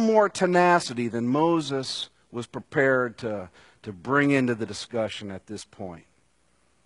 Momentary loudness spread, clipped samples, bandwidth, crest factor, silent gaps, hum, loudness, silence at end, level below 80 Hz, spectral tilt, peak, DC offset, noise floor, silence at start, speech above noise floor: 18 LU; under 0.1%; 11 kHz; 20 dB; none; none; -24 LUFS; 0.85 s; -66 dBFS; -5.5 dB/octave; -6 dBFS; under 0.1%; -67 dBFS; 0 s; 42 dB